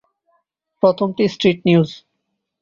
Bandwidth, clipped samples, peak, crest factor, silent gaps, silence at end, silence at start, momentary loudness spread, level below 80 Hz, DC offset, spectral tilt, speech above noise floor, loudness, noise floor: 7.2 kHz; under 0.1%; -2 dBFS; 18 dB; none; 0.65 s; 0.85 s; 4 LU; -58 dBFS; under 0.1%; -7.5 dB/octave; 59 dB; -17 LUFS; -75 dBFS